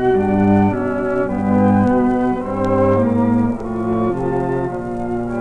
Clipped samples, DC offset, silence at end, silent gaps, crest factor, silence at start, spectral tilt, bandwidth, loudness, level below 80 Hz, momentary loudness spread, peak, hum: under 0.1%; under 0.1%; 0 s; none; 14 dB; 0 s; -9.5 dB/octave; 9.2 kHz; -17 LUFS; -38 dBFS; 8 LU; -4 dBFS; none